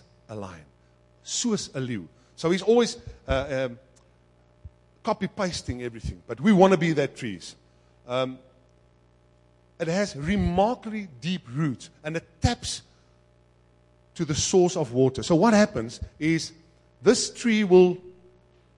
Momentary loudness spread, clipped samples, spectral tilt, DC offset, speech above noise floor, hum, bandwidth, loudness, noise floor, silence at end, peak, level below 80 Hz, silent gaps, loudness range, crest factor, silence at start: 17 LU; under 0.1%; -5 dB/octave; under 0.1%; 36 dB; 60 Hz at -55 dBFS; 11.5 kHz; -25 LUFS; -60 dBFS; 0.65 s; -2 dBFS; -48 dBFS; none; 8 LU; 24 dB; 0.3 s